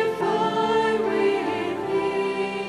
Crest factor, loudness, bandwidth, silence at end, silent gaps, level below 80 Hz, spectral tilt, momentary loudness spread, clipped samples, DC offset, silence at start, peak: 12 dB; -23 LUFS; 12.5 kHz; 0 s; none; -60 dBFS; -5.5 dB/octave; 4 LU; under 0.1%; under 0.1%; 0 s; -10 dBFS